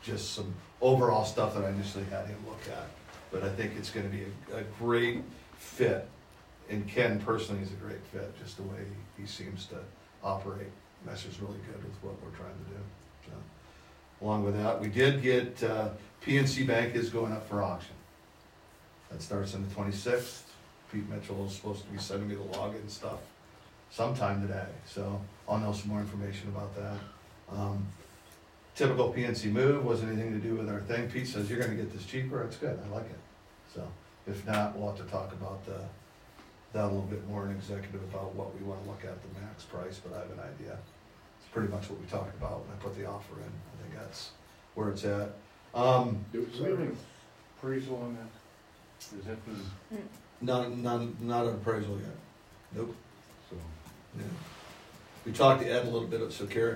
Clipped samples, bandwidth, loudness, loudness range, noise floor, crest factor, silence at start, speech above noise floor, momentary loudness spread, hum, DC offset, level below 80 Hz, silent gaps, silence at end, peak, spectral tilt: under 0.1%; 16 kHz; -34 LUFS; 10 LU; -58 dBFS; 26 dB; 0 s; 24 dB; 19 LU; none; under 0.1%; -60 dBFS; none; 0 s; -8 dBFS; -6 dB/octave